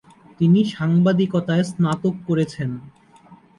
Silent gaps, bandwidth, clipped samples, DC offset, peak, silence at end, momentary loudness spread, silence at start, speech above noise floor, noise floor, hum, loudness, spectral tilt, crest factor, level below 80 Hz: none; 11 kHz; under 0.1%; under 0.1%; -6 dBFS; 0.25 s; 9 LU; 0.4 s; 30 dB; -49 dBFS; none; -20 LUFS; -8 dB/octave; 14 dB; -58 dBFS